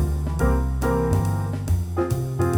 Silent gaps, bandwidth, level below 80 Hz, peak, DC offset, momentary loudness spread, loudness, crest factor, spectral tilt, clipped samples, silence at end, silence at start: none; 19.5 kHz; -28 dBFS; -8 dBFS; under 0.1%; 3 LU; -23 LUFS; 14 dB; -7.5 dB/octave; under 0.1%; 0 s; 0 s